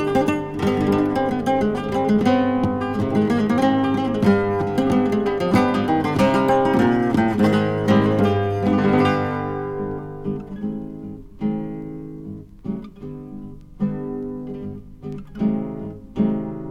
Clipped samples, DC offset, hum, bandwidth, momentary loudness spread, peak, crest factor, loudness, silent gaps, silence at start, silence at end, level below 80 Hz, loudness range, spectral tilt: under 0.1%; under 0.1%; none; 13.5 kHz; 17 LU; -4 dBFS; 18 dB; -20 LUFS; none; 0 s; 0 s; -44 dBFS; 12 LU; -7.5 dB/octave